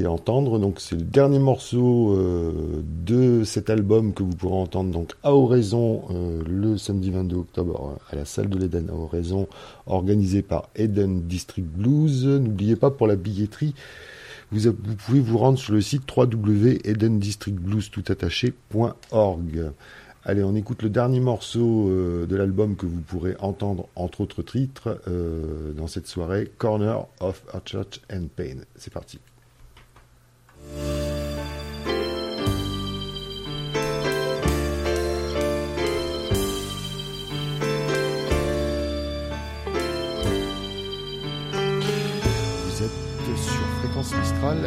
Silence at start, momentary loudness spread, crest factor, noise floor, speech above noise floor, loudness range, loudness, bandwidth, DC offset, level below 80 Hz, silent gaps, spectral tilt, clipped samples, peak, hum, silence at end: 0 s; 12 LU; 18 dB; -55 dBFS; 32 dB; 7 LU; -24 LUFS; 16 kHz; under 0.1%; -38 dBFS; none; -6.5 dB/octave; under 0.1%; -6 dBFS; none; 0 s